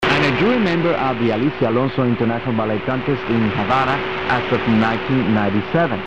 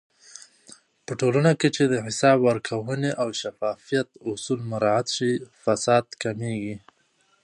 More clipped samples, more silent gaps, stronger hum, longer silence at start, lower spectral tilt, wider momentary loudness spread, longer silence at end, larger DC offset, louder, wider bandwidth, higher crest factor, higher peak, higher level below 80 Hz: neither; neither; neither; second, 0 s vs 0.35 s; first, -7.5 dB/octave vs -5 dB/octave; second, 4 LU vs 14 LU; second, 0 s vs 0.65 s; first, 1% vs under 0.1%; first, -18 LUFS vs -24 LUFS; second, 8.4 kHz vs 11.5 kHz; second, 12 dB vs 20 dB; about the same, -4 dBFS vs -4 dBFS; first, -44 dBFS vs -66 dBFS